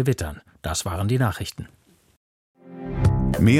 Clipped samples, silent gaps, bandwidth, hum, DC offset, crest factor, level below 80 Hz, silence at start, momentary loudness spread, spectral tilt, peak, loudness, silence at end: under 0.1%; 2.17-2.54 s; 16 kHz; none; under 0.1%; 18 dB; -36 dBFS; 0 s; 18 LU; -6 dB/octave; -4 dBFS; -25 LUFS; 0 s